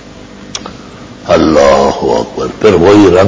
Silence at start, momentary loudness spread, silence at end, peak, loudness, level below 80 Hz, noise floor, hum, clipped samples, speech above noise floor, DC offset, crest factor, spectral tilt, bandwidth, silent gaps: 0.25 s; 20 LU; 0 s; 0 dBFS; -8 LUFS; -30 dBFS; -30 dBFS; none; 1%; 24 dB; under 0.1%; 8 dB; -5.5 dB/octave; 8 kHz; none